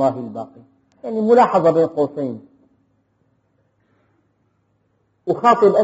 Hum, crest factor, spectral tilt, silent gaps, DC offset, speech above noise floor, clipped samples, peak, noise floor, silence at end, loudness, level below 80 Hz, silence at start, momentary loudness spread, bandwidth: none; 18 dB; -6 dB/octave; none; under 0.1%; 49 dB; under 0.1%; -2 dBFS; -65 dBFS; 0 s; -17 LUFS; -68 dBFS; 0 s; 20 LU; 8 kHz